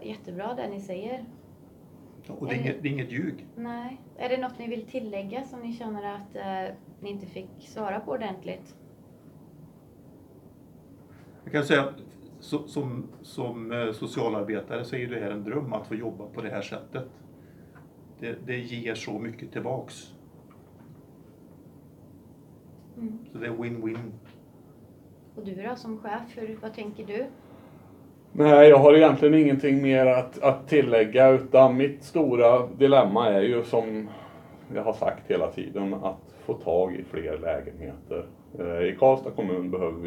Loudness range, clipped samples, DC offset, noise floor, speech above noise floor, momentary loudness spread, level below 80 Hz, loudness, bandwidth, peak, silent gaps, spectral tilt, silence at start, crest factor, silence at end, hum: 20 LU; under 0.1%; under 0.1%; -52 dBFS; 27 dB; 21 LU; -62 dBFS; -24 LUFS; 11.5 kHz; -2 dBFS; none; -7.5 dB/octave; 0 s; 24 dB; 0 s; none